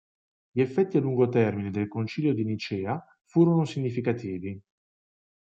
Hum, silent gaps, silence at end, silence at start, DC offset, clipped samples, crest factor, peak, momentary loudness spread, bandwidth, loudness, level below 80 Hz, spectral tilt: none; 3.21-3.25 s; 0.85 s; 0.55 s; under 0.1%; under 0.1%; 18 dB; -10 dBFS; 12 LU; 7.8 kHz; -27 LUFS; -72 dBFS; -8.5 dB/octave